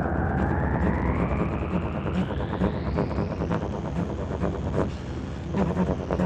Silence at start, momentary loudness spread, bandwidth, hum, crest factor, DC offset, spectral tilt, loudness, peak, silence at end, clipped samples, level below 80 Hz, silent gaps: 0 s; 5 LU; 8.4 kHz; none; 18 dB; under 0.1%; -8.5 dB/octave; -27 LUFS; -8 dBFS; 0 s; under 0.1%; -34 dBFS; none